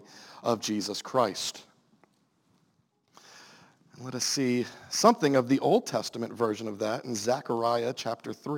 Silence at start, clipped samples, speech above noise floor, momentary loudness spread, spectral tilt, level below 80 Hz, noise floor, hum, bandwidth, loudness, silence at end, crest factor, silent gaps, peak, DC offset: 0.1 s; under 0.1%; 43 dB; 11 LU; -4 dB/octave; -78 dBFS; -71 dBFS; none; 17 kHz; -28 LUFS; 0 s; 24 dB; none; -6 dBFS; under 0.1%